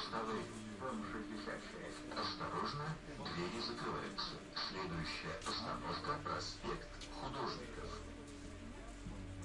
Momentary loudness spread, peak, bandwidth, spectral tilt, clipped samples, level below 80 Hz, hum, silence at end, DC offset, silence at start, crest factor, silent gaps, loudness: 9 LU; -28 dBFS; 11.5 kHz; -4.5 dB/octave; under 0.1%; -58 dBFS; none; 0 s; under 0.1%; 0 s; 16 dB; none; -44 LUFS